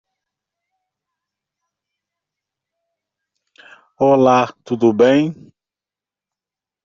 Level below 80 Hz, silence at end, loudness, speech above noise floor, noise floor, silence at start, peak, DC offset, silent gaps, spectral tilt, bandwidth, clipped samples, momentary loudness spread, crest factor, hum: -64 dBFS; 1.5 s; -15 LUFS; 74 dB; -89 dBFS; 4 s; -2 dBFS; under 0.1%; none; -5.5 dB/octave; 7.4 kHz; under 0.1%; 8 LU; 18 dB; none